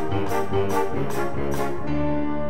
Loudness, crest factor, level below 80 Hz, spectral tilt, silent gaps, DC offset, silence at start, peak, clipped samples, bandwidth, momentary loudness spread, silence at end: -26 LUFS; 14 dB; -42 dBFS; -6.5 dB/octave; none; 7%; 0 s; -8 dBFS; under 0.1%; 16 kHz; 3 LU; 0 s